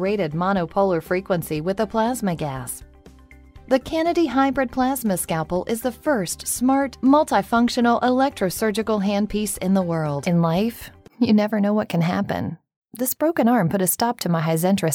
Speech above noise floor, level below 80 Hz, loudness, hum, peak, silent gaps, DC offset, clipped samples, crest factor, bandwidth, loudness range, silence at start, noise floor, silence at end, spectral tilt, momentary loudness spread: 26 dB; -48 dBFS; -21 LUFS; none; -4 dBFS; 12.76-12.82 s; under 0.1%; under 0.1%; 18 dB; over 20 kHz; 4 LU; 0 s; -47 dBFS; 0 s; -5.5 dB/octave; 7 LU